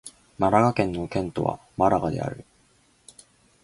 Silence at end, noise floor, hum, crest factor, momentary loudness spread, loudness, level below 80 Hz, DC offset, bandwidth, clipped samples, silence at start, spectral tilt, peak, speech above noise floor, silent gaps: 1.2 s; -62 dBFS; none; 22 dB; 13 LU; -24 LUFS; -50 dBFS; under 0.1%; 11.5 kHz; under 0.1%; 0.05 s; -7 dB/octave; -4 dBFS; 38 dB; none